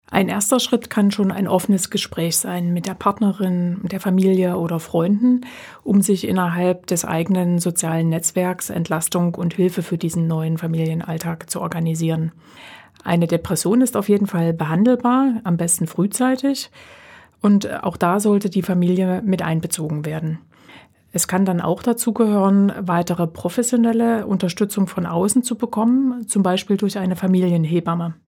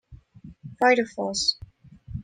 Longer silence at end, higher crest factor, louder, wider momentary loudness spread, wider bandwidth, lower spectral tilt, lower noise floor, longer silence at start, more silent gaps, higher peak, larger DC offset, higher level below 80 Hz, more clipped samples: first, 0.15 s vs 0 s; about the same, 18 dB vs 20 dB; first, -19 LUFS vs -23 LUFS; second, 6 LU vs 22 LU; first, 18 kHz vs 9.8 kHz; first, -5.5 dB/octave vs -3 dB/octave; about the same, -47 dBFS vs -48 dBFS; about the same, 0.1 s vs 0.1 s; neither; first, -2 dBFS vs -6 dBFS; neither; about the same, -56 dBFS vs -52 dBFS; neither